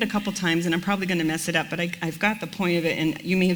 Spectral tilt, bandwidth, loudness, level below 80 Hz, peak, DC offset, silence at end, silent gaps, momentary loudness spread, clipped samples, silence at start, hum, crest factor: -5 dB/octave; over 20 kHz; -24 LUFS; -56 dBFS; -6 dBFS; under 0.1%; 0 s; none; 4 LU; under 0.1%; 0 s; none; 18 dB